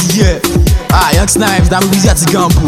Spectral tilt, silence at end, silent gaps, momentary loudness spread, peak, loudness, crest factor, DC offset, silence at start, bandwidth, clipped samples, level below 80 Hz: -4.5 dB/octave; 0 s; none; 2 LU; 0 dBFS; -9 LUFS; 8 dB; under 0.1%; 0 s; 16.5 kHz; under 0.1%; -14 dBFS